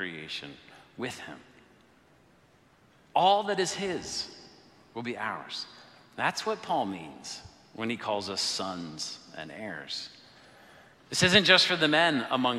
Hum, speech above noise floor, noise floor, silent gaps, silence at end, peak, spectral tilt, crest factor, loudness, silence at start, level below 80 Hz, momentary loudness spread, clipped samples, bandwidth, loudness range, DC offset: none; 33 dB; -62 dBFS; none; 0 s; -4 dBFS; -3 dB/octave; 26 dB; -28 LUFS; 0 s; -66 dBFS; 21 LU; under 0.1%; 15 kHz; 9 LU; under 0.1%